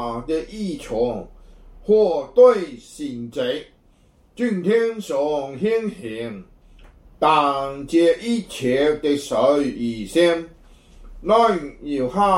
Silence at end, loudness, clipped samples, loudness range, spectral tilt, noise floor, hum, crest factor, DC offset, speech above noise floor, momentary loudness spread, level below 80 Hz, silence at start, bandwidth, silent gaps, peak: 0 s; -20 LUFS; under 0.1%; 4 LU; -5.5 dB/octave; -55 dBFS; none; 18 dB; under 0.1%; 35 dB; 14 LU; -48 dBFS; 0 s; 14 kHz; none; -4 dBFS